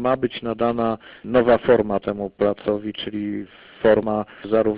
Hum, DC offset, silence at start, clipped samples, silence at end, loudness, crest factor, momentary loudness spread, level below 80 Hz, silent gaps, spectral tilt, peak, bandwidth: none; under 0.1%; 0 s; under 0.1%; 0 s; -21 LUFS; 16 dB; 11 LU; -50 dBFS; none; -11 dB/octave; -4 dBFS; 5 kHz